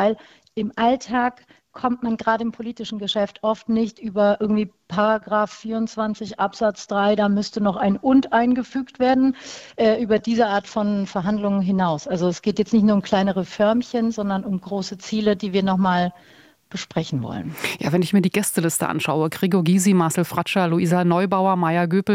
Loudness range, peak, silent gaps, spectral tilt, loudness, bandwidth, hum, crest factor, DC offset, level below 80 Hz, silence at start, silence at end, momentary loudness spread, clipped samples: 4 LU; -4 dBFS; none; -5.5 dB/octave; -21 LUFS; 16 kHz; none; 16 dB; under 0.1%; -56 dBFS; 0 s; 0 s; 9 LU; under 0.1%